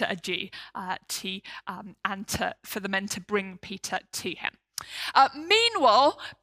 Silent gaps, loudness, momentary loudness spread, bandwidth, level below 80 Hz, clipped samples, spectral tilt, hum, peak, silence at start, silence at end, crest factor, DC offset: none; -26 LUFS; 17 LU; 16 kHz; -62 dBFS; under 0.1%; -2.5 dB/octave; none; -6 dBFS; 0 s; 0.1 s; 22 dB; under 0.1%